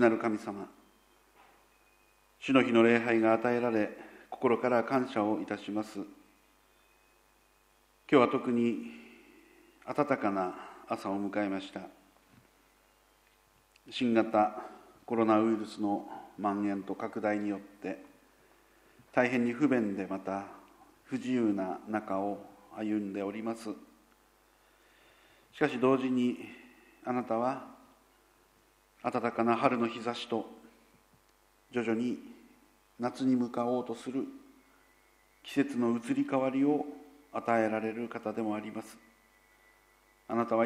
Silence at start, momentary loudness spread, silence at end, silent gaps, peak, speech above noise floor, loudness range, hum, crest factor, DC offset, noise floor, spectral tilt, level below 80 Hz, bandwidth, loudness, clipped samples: 0 s; 17 LU; 0 s; none; -10 dBFS; 37 dB; 7 LU; 50 Hz at -75 dBFS; 24 dB; under 0.1%; -67 dBFS; -6.5 dB/octave; -74 dBFS; 15 kHz; -32 LUFS; under 0.1%